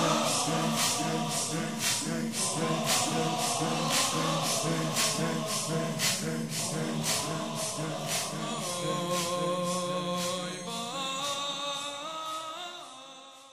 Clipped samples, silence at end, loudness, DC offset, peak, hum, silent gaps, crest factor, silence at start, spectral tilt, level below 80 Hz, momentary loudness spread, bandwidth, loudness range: under 0.1%; 0 s; -30 LUFS; 0.2%; -14 dBFS; none; none; 18 dB; 0 s; -3 dB/octave; -68 dBFS; 9 LU; 16 kHz; 5 LU